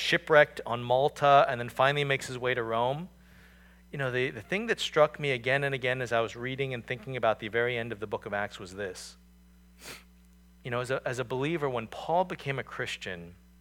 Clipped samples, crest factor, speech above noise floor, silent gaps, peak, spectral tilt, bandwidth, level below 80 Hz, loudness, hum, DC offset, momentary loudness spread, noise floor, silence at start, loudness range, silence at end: under 0.1%; 22 dB; 28 dB; none; -8 dBFS; -5 dB/octave; 17.5 kHz; -60 dBFS; -29 LUFS; none; under 0.1%; 16 LU; -57 dBFS; 0 s; 8 LU; 0.25 s